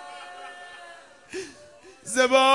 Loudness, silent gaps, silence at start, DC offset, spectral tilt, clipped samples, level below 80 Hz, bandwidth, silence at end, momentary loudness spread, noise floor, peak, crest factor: -24 LUFS; none; 0 s; under 0.1%; -1 dB/octave; under 0.1%; -70 dBFS; 11.5 kHz; 0 s; 25 LU; -50 dBFS; -6 dBFS; 20 dB